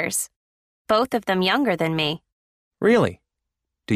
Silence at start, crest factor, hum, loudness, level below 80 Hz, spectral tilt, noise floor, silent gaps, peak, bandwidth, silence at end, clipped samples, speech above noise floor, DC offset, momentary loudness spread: 0 s; 18 dB; none; -21 LUFS; -60 dBFS; -4 dB/octave; -82 dBFS; 0.36-0.85 s, 2.33-2.71 s; -6 dBFS; 15.5 kHz; 0 s; under 0.1%; 62 dB; under 0.1%; 7 LU